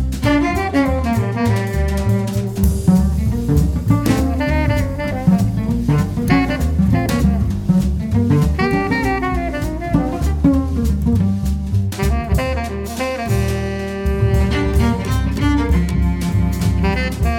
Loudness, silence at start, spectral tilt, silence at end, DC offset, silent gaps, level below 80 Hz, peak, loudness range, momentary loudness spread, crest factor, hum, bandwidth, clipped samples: -18 LUFS; 0 s; -7 dB/octave; 0 s; under 0.1%; none; -22 dBFS; -2 dBFS; 2 LU; 5 LU; 14 dB; none; 17.5 kHz; under 0.1%